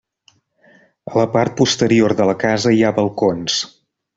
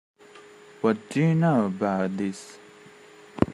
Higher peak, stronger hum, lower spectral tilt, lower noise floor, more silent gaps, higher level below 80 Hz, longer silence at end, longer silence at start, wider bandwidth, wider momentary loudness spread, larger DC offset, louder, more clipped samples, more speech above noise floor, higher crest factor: about the same, -2 dBFS vs -4 dBFS; neither; second, -5 dB/octave vs -7.5 dB/octave; first, -57 dBFS vs -50 dBFS; neither; about the same, -54 dBFS vs -58 dBFS; first, 0.5 s vs 0 s; first, 1.05 s vs 0.35 s; second, 8 kHz vs 11 kHz; second, 7 LU vs 18 LU; neither; first, -16 LUFS vs -25 LUFS; neither; first, 42 dB vs 26 dB; second, 16 dB vs 24 dB